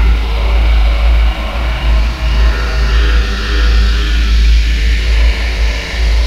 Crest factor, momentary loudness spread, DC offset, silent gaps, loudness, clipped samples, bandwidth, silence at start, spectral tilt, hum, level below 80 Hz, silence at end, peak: 10 dB; 4 LU; under 0.1%; none; -14 LUFS; under 0.1%; 7.4 kHz; 0 s; -5 dB/octave; none; -10 dBFS; 0 s; 0 dBFS